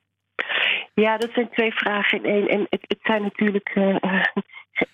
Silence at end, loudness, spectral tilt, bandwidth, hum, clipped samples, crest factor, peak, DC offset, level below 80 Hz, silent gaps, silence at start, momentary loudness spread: 0.1 s; -22 LUFS; -6.5 dB/octave; 10 kHz; none; under 0.1%; 18 dB; -4 dBFS; under 0.1%; -66 dBFS; none; 0.4 s; 6 LU